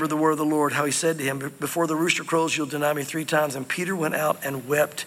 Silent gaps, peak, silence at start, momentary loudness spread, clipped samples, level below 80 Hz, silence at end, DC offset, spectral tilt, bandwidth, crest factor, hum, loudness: none; -4 dBFS; 0 s; 5 LU; under 0.1%; -72 dBFS; 0 s; under 0.1%; -4 dB/octave; 16.5 kHz; 20 dB; none; -24 LUFS